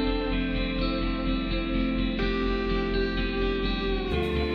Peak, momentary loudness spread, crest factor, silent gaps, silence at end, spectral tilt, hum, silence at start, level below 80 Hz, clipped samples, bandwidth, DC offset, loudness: -14 dBFS; 1 LU; 12 dB; none; 0 s; -7.5 dB/octave; none; 0 s; -32 dBFS; under 0.1%; 5.8 kHz; under 0.1%; -28 LUFS